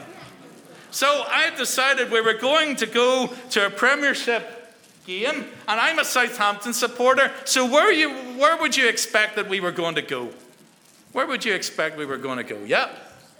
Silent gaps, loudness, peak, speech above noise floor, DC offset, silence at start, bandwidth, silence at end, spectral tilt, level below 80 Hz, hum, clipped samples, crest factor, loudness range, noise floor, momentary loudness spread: none; -21 LUFS; -2 dBFS; 31 dB; under 0.1%; 0 s; over 20 kHz; 0.3 s; -1.5 dB/octave; -76 dBFS; none; under 0.1%; 20 dB; 7 LU; -53 dBFS; 11 LU